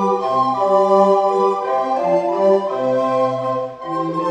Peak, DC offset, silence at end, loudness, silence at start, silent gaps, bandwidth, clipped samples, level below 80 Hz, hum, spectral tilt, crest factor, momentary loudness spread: -2 dBFS; under 0.1%; 0 s; -17 LUFS; 0 s; none; 9 kHz; under 0.1%; -64 dBFS; none; -7 dB/octave; 14 dB; 9 LU